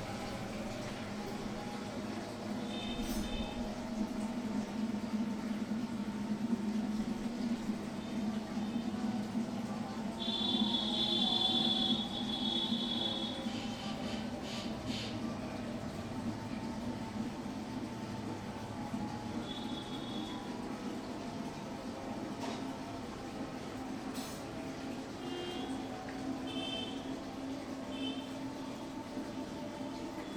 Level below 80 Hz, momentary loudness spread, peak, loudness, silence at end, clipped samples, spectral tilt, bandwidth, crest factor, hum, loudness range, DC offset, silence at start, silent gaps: -58 dBFS; 10 LU; -20 dBFS; -38 LUFS; 0 s; under 0.1%; -4.5 dB/octave; 17.5 kHz; 18 dB; none; 10 LU; under 0.1%; 0 s; none